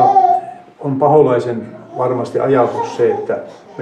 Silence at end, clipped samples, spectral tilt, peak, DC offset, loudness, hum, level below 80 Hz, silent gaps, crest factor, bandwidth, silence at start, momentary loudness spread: 0 s; under 0.1%; -8 dB/octave; 0 dBFS; under 0.1%; -15 LUFS; none; -62 dBFS; none; 14 dB; 9.4 kHz; 0 s; 15 LU